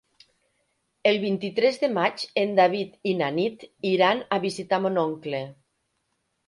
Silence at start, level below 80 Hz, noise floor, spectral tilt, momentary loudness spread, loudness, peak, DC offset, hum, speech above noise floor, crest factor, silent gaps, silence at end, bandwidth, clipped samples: 1.05 s; -72 dBFS; -75 dBFS; -5.5 dB/octave; 9 LU; -24 LUFS; -6 dBFS; under 0.1%; none; 51 dB; 20 dB; none; 0.95 s; 11.5 kHz; under 0.1%